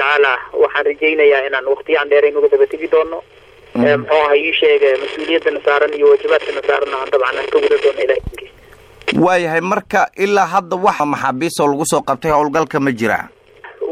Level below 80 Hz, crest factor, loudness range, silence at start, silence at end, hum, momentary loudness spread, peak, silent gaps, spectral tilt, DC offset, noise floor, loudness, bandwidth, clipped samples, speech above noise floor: -46 dBFS; 12 dB; 3 LU; 0 s; 0 s; none; 6 LU; -2 dBFS; none; -4.5 dB/octave; under 0.1%; -43 dBFS; -15 LUFS; 14.5 kHz; under 0.1%; 28 dB